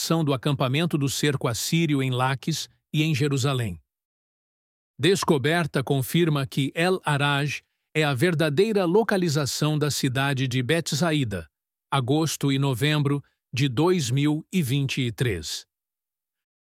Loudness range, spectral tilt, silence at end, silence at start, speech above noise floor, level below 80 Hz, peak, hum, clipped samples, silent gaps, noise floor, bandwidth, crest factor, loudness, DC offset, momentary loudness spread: 3 LU; -5 dB/octave; 1 s; 0 s; over 67 dB; -58 dBFS; -8 dBFS; none; under 0.1%; 4.05-4.94 s; under -90 dBFS; 16 kHz; 16 dB; -24 LUFS; under 0.1%; 7 LU